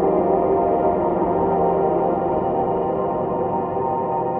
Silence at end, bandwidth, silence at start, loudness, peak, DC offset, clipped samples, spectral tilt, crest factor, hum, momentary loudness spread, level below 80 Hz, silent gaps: 0 s; 3.4 kHz; 0 s; -20 LUFS; -6 dBFS; under 0.1%; under 0.1%; -12.5 dB/octave; 12 dB; none; 4 LU; -44 dBFS; none